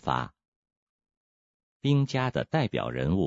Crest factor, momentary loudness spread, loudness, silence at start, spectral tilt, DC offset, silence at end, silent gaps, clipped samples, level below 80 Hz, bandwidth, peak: 20 dB; 7 LU; -28 LUFS; 0.05 s; -7.5 dB/octave; under 0.1%; 0 s; 0.48-0.63 s, 0.77-0.99 s, 1.17-1.80 s; under 0.1%; -54 dBFS; 7.8 kHz; -10 dBFS